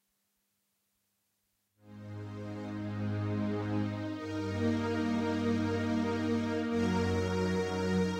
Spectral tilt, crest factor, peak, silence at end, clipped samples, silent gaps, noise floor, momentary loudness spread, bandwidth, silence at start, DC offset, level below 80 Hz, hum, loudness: -7 dB/octave; 14 dB; -20 dBFS; 0 s; under 0.1%; none; -80 dBFS; 10 LU; 12 kHz; 1.85 s; under 0.1%; -62 dBFS; none; -33 LUFS